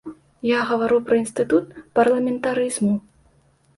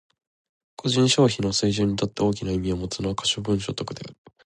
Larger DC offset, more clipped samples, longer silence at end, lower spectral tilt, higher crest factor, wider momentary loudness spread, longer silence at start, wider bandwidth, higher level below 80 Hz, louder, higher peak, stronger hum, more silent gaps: neither; neither; first, 0.8 s vs 0.3 s; about the same, -5 dB/octave vs -5 dB/octave; about the same, 16 dB vs 18 dB; second, 6 LU vs 12 LU; second, 0.05 s vs 0.8 s; about the same, 11.5 kHz vs 11.5 kHz; second, -60 dBFS vs -46 dBFS; first, -21 LUFS vs -24 LUFS; about the same, -4 dBFS vs -6 dBFS; neither; neither